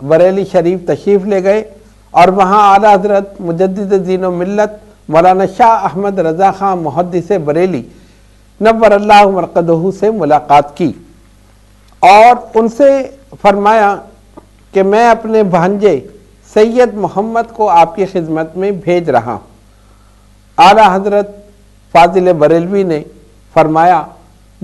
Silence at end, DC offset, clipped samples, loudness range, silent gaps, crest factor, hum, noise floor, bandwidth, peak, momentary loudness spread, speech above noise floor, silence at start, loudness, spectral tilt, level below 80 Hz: 0.55 s; under 0.1%; 1%; 3 LU; none; 10 dB; 50 Hz at -40 dBFS; -43 dBFS; 12.5 kHz; 0 dBFS; 10 LU; 34 dB; 0 s; -10 LUFS; -6.5 dB/octave; -42 dBFS